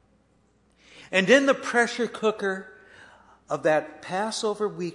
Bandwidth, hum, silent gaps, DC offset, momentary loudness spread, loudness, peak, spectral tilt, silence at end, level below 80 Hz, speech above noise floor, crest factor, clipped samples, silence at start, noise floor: 11 kHz; none; none; under 0.1%; 11 LU; -24 LUFS; -6 dBFS; -4 dB/octave; 0 s; -70 dBFS; 40 dB; 22 dB; under 0.1%; 0.95 s; -64 dBFS